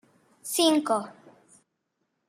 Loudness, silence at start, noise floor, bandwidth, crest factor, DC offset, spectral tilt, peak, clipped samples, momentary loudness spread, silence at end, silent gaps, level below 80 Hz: -25 LUFS; 0.45 s; -79 dBFS; 15.5 kHz; 20 dB; under 0.1%; -2.5 dB/octave; -8 dBFS; under 0.1%; 20 LU; 1.15 s; none; -84 dBFS